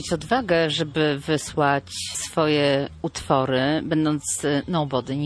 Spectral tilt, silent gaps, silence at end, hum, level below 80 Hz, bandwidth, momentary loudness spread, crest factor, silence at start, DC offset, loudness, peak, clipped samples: -4.5 dB/octave; none; 0 s; none; -50 dBFS; 11 kHz; 5 LU; 18 dB; 0 s; under 0.1%; -23 LUFS; -4 dBFS; under 0.1%